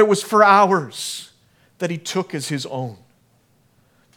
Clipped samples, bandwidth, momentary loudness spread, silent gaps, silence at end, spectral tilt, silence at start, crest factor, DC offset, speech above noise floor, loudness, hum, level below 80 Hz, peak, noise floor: under 0.1%; 18 kHz; 17 LU; none; 1.2 s; -4.5 dB/octave; 0 s; 20 dB; under 0.1%; 41 dB; -19 LUFS; none; -70 dBFS; 0 dBFS; -59 dBFS